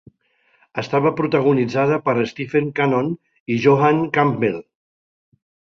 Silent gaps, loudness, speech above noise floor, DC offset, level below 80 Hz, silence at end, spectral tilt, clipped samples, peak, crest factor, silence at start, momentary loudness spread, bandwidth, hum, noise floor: 3.40-3.46 s; -19 LUFS; 44 dB; under 0.1%; -60 dBFS; 1.05 s; -7.5 dB/octave; under 0.1%; -2 dBFS; 18 dB; 0.75 s; 10 LU; 7 kHz; none; -62 dBFS